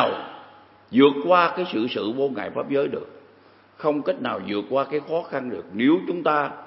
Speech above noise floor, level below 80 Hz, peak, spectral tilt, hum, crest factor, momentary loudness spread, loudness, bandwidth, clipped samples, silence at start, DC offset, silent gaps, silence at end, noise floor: 31 dB; -72 dBFS; -4 dBFS; -10 dB/octave; none; 20 dB; 12 LU; -23 LUFS; 5.8 kHz; under 0.1%; 0 s; under 0.1%; none; 0 s; -53 dBFS